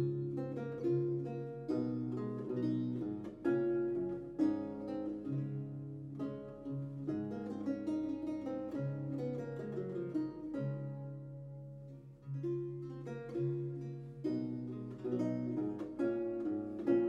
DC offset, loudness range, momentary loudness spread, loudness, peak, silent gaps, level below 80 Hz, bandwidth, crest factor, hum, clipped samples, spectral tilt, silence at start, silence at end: under 0.1%; 5 LU; 10 LU; -40 LUFS; -20 dBFS; none; -68 dBFS; 7.2 kHz; 18 dB; none; under 0.1%; -10 dB/octave; 0 s; 0 s